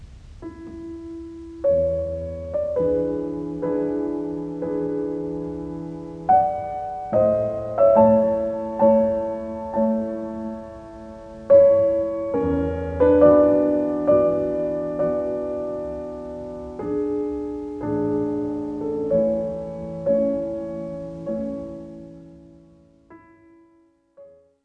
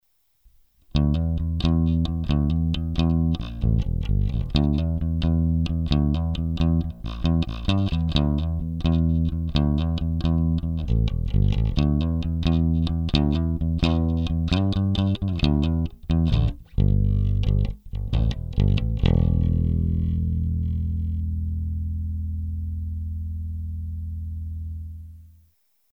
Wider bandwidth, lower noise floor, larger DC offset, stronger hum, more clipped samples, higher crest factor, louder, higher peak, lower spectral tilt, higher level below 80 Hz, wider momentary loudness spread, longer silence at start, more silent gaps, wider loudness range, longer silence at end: second, 3.9 kHz vs 6.6 kHz; second, -59 dBFS vs -64 dBFS; neither; neither; neither; about the same, 20 dB vs 20 dB; about the same, -22 LUFS vs -24 LUFS; about the same, -2 dBFS vs -4 dBFS; first, -10 dB/octave vs -8.5 dB/octave; second, -46 dBFS vs -28 dBFS; first, 19 LU vs 9 LU; second, 0 s vs 0.95 s; neither; first, 9 LU vs 6 LU; second, 0.35 s vs 0.65 s